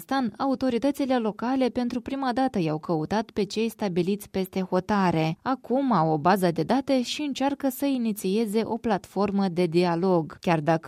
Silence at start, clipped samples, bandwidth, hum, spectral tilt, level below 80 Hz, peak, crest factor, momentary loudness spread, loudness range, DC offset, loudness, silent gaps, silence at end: 0 s; under 0.1%; 16 kHz; none; -6.5 dB/octave; -60 dBFS; -8 dBFS; 18 dB; 5 LU; 2 LU; under 0.1%; -26 LUFS; none; 0 s